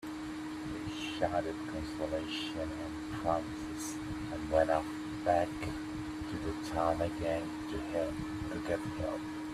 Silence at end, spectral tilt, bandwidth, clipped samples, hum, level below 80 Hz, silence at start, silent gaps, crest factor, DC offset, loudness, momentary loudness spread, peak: 0 s; -5.5 dB/octave; 14 kHz; under 0.1%; none; -54 dBFS; 0 s; none; 20 dB; under 0.1%; -36 LUFS; 8 LU; -16 dBFS